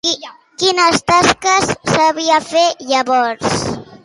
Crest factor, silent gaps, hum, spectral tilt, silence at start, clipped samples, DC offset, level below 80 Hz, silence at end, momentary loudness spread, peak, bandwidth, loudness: 14 dB; none; none; -3 dB/octave; 0.05 s; under 0.1%; under 0.1%; -46 dBFS; 0.1 s; 8 LU; 0 dBFS; 11.5 kHz; -14 LUFS